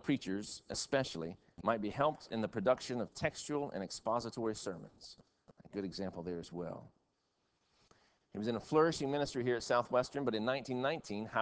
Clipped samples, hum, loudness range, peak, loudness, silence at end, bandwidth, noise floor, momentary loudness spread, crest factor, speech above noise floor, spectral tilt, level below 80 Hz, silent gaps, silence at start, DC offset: under 0.1%; none; 11 LU; -16 dBFS; -37 LUFS; 0 s; 8 kHz; -81 dBFS; 12 LU; 22 dB; 44 dB; -5 dB/octave; -66 dBFS; none; 0.05 s; under 0.1%